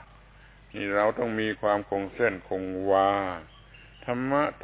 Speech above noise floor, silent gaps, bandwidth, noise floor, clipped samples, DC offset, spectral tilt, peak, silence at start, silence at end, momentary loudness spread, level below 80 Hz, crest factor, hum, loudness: 26 dB; none; 4 kHz; -53 dBFS; under 0.1%; under 0.1%; -9.5 dB/octave; -10 dBFS; 0 s; 0.05 s; 11 LU; -54 dBFS; 18 dB; none; -27 LUFS